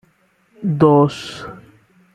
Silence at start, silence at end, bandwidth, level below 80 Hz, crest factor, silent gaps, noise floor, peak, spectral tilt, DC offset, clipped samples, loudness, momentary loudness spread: 0.6 s; 0.6 s; 10 kHz; -54 dBFS; 16 dB; none; -59 dBFS; -2 dBFS; -8 dB/octave; under 0.1%; under 0.1%; -15 LUFS; 20 LU